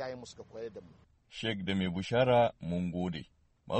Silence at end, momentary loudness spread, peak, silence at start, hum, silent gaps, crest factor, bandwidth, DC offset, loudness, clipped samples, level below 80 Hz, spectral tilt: 0 s; 19 LU; -16 dBFS; 0 s; none; none; 18 dB; 8.4 kHz; under 0.1%; -32 LUFS; under 0.1%; -60 dBFS; -6.5 dB/octave